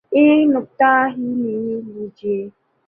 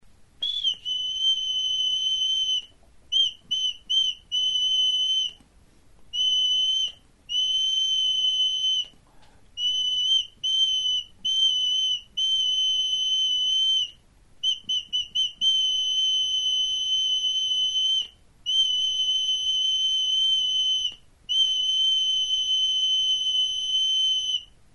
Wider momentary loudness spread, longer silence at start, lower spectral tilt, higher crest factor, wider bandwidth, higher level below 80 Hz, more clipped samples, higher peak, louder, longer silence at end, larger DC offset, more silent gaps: first, 15 LU vs 6 LU; second, 0.1 s vs 0.4 s; first, -9 dB/octave vs 2.5 dB/octave; about the same, 16 dB vs 12 dB; second, 3.5 kHz vs 10 kHz; second, -66 dBFS vs -60 dBFS; neither; first, -2 dBFS vs -14 dBFS; first, -18 LUFS vs -22 LUFS; first, 0.4 s vs 0.2 s; second, under 0.1% vs 0.2%; neither